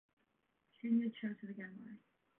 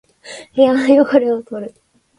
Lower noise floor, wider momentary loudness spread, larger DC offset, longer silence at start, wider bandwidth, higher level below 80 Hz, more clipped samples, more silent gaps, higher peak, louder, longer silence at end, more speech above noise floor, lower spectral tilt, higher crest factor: first, -81 dBFS vs -37 dBFS; second, 19 LU vs 22 LU; neither; first, 0.85 s vs 0.25 s; second, 3.6 kHz vs 11 kHz; second, under -90 dBFS vs -60 dBFS; neither; neither; second, -26 dBFS vs 0 dBFS; second, -41 LUFS vs -14 LUFS; about the same, 0.4 s vs 0.5 s; first, 41 dB vs 23 dB; about the same, -6.5 dB/octave vs -5.5 dB/octave; about the same, 18 dB vs 16 dB